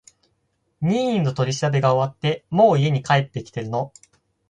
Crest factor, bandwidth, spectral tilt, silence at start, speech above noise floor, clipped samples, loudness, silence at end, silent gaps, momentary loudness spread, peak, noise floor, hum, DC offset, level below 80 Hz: 18 dB; 9.4 kHz; -6.5 dB/octave; 0.8 s; 50 dB; under 0.1%; -21 LUFS; 0.6 s; none; 11 LU; -4 dBFS; -70 dBFS; none; under 0.1%; -58 dBFS